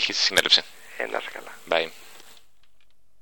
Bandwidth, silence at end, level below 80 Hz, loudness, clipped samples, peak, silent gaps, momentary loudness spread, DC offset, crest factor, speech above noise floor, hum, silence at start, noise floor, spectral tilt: 17.5 kHz; 1.3 s; -64 dBFS; -22 LUFS; under 0.1%; -2 dBFS; none; 20 LU; 0.5%; 26 dB; 41 dB; none; 0 s; -66 dBFS; 0 dB/octave